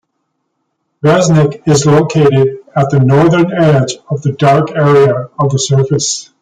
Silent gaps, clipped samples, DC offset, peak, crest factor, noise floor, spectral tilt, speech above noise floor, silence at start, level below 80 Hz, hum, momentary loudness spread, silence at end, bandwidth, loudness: none; under 0.1%; under 0.1%; 0 dBFS; 10 dB; -67 dBFS; -6 dB/octave; 58 dB; 1.05 s; -46 dBFS; none; 7 LU; 0.2 s; 9.4 kHz; -11 LUFS